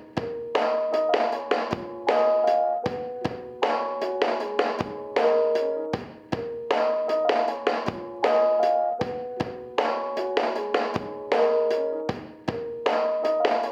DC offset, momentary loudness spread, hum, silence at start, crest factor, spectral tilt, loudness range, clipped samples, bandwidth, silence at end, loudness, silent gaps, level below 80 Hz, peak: under 0.1%; 10 LU; none; 0 s; 18 dB; -5.5 dB/octave; 1 LU; under 0.1%; 8.6 kHz; 0 s; -25 LUFS; none; -62 dBFS; -8 dBFS